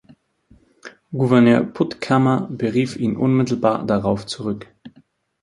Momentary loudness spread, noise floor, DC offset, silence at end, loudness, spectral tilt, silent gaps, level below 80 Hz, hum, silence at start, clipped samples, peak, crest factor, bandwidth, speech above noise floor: 12 LU; -56 dBFS; under 0.1%; 0.55 s; -19 LUFS; -7.5 dB/octave; none; -54 dBFS; none; 0.85 s; under 0.1%; 0 dBFS; 18 dB; 11.5 kHz; 38 dB